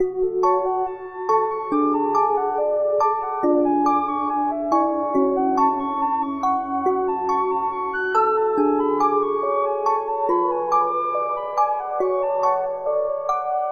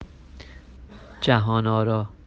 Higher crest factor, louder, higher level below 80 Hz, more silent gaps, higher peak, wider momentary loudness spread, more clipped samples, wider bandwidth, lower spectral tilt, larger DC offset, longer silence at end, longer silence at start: second, 14 dB vs 22 dB; about the same, -21 LUFS vs -22 LUFS; second, -58 dBFS vs -46 dBFS; neither; second, -8 dBFS vs -4 dBFS; second, 4 LU vs 24 LU; neither; about the same, 7.4 kHz vs 7.4 kHz; second, -6 dB/octave vs -7.5 dB/octave; neither; second, 0 s vs 0.15 s; about the same, 0 s vs 0 s